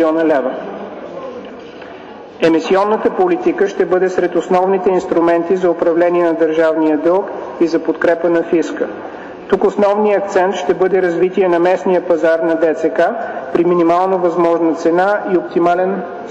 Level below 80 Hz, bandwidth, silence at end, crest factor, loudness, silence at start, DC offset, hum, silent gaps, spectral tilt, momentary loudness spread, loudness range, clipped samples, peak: -54 dBFS; 8 kHz; 0 s; 10 dB; -14 LUFS; 0 s; under 0.1%; none; none; -6.5 dB/octave; 15 LU; 2 LU; under 0.1%; -4 dBFS